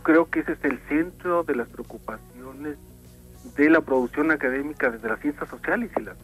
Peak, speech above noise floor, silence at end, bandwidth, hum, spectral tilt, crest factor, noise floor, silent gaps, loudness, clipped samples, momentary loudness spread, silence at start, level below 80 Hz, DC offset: -6 dBFS; 22 dB; 0 s; 14.5 kHz; 60 Hz at -50 dBFS; -7 dB/octave; 18 dB; -47 dBFS; none; -24 LUFS; under 0.1%; 17 LU; 0 s; -50 dBFS; under 0.1%